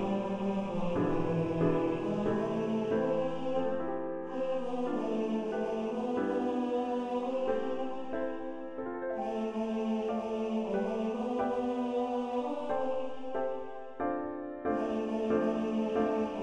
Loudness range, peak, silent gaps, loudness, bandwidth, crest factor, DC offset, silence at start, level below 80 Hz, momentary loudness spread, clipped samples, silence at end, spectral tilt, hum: 3 LU; -16 dBFS; none; -33 LUFS; 9.6 kHz; 16 dB; under 0.1%; 0 s; -56 dBFS; 7 LU; under 0.1%; 0 s; -8 dB/octave; none